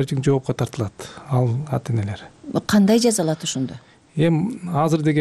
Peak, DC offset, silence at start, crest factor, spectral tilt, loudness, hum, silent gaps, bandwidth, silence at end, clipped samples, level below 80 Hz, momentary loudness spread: -8 dBFS; under 0.1%; 0 s; 12 dB; -6 dB/octave; -21 LUFS; none; none; 15 kHz; 0 s; under 0.1%; -54 dBFS; 14 LU